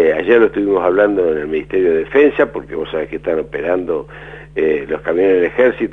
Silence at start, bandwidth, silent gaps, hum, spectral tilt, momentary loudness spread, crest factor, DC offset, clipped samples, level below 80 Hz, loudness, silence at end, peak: 0 s; 4 kHz; none; none; -8 dB/octave; 10 LU; 14 dB; 0.2%; under 0.1%; -44 dBFS; -15 LUFS; 0 s; 0 dBFS